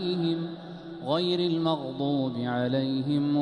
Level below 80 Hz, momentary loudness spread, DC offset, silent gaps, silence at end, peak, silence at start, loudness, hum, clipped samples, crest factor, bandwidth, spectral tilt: -66 dBFS; 11 LU; under 0.1%; none; 0 s; -12 dBFS; 0 s; -28 LUFS; none; under 0.1%; 14 dB; 10 kHz; -8 dB/octave